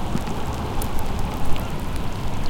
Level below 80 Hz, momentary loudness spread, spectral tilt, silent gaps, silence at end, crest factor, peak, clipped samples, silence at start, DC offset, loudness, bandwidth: -28 dBFS; 2 LU; -5.5 dB/octave; none; 0 s; 14 dB; -6 dBFS; under 0.1%; 0 s; under 0.1%; -28 LUFS; 17 kHz